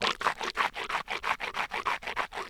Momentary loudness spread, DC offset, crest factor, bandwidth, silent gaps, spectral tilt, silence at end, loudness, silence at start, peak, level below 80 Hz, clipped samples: 2 LU; under 0.1%; 24 dB; over 20 kHz; none; -1.5 dB/octave; 0 s; -31 LUFS; 0 s; -10 dBFS; -58 dBFS; under 0.1%